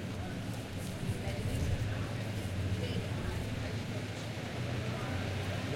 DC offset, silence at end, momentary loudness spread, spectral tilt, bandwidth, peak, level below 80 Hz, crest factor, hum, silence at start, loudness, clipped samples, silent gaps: under 0.1%; 0 s; 4 LU; -6 dB/octave; 16.5 kHz; -22 dBFS; -48 dBFS; 14 dB; none; 0 s; -37 LUFS; under 0.1%; none